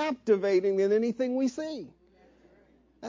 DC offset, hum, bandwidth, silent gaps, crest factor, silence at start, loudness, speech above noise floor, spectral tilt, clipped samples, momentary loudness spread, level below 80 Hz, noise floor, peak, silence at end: under 0.1%; none; 7.6 kHz; none; 16 dB; 0 s; -27 LUFS; 35 dB; -6 dB/octave; under 0.1%; 14 LU; -70 dBFS; -62 dBFS; -12 dBFS; 0 s